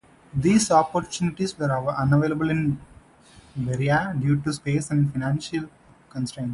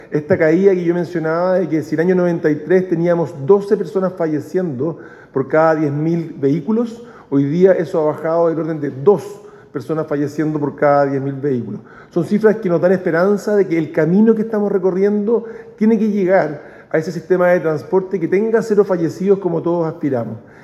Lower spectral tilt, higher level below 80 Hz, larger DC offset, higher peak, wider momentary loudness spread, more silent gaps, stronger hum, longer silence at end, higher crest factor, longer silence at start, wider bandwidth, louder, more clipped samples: second, -6 dB/octave vs -8.5 dB/octave; first, -50 dBFS vs -62 dBFS; neither; second, -4 dBFS vs 0 dBFS; first, 12 LU vs 9 LU; neither; neither; second, 0 s vs 0.2 s; about the same, 20 dB vs 16 dB; first, 0.35 s vs 0 s; about the same, 11.5 kHz vs 12 kHz; second, -24 LUFS vs -16 LUFS; neither